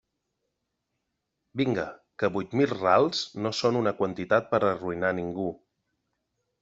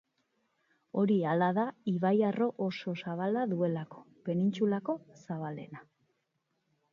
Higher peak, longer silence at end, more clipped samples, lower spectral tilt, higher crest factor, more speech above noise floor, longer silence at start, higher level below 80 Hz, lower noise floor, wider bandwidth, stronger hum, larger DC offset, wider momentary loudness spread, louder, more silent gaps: first, -8 dBFS vs -16 dBFS; about the same, 1.05 s vs 1.1 s; neither; second, -5.5 dB/octave vs -8.5 dB/octave; first, 22 dB vs 16 dB; first, 55 dB vs 49 dB; first, 1.55 s vs 0.95 s; first, -66 dBFS vs -80 dBFS; about the same, -81 dBFS vs -80 dBFS; first, 8 kHz vs 7 kHz; neither; neither; second, 10 LU vs 14 LU; first, -27 LUFS vs -32 LUFS; neither